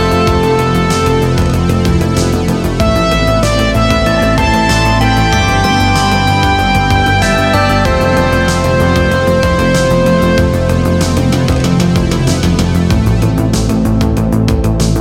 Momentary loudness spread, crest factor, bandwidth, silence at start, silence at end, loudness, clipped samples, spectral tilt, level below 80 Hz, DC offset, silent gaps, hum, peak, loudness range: 2 LU; 10 dB; 17 kHz; 0 s; 0 s; -11 LUFS; under 0.1%; -5.5 dB/octave; -20 dBFS; under 0.1%; none; none; 0 dBFS; 2 LU